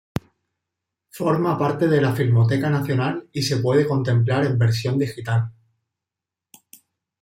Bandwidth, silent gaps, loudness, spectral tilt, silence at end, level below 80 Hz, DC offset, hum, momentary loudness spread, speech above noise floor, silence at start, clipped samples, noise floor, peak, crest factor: 15.5 kHz; none; -21 LUFS; -7 dB/octave; 1.7 s; -56 dBFS; under 0.1%; none; 7 LU; 67 dB; 1.15 s; under 0.1%; -87 dBFS; -6 dBFS; 16 dB